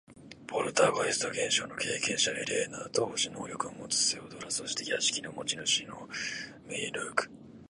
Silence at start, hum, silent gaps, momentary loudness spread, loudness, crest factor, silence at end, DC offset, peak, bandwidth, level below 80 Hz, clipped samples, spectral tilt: 0.1 s; none; none; 10 LU; -31 LUFS; 24 dB; 0.05 s; under 0.1%; -10 dBFS; 11.5 kHz; -68 dBFS; under 0.1%; -1.5 dB/octave